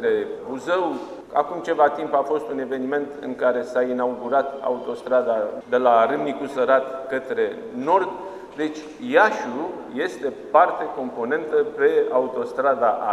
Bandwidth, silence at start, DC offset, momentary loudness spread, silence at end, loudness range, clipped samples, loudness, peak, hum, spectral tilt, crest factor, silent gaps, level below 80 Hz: 11.5 kHz; 0 s; under 0.1%; 11 LU; 0 s; 2 LU; under 0.1%; -22 LUFS; -2 dBFS; none; -5.5 dB/octave; 20 dB; none; -66 dBFS